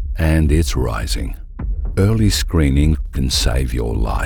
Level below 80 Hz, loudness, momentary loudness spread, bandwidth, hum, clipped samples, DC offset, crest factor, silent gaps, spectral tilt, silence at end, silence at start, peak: -20 dBFS; -18 LUFS; 10 LU; 18.5 kHz; none; under 0.1%; under 0.1%; 14 dB; none; -5.5 dB/octave; 0 s; 0 s; -2 dBFS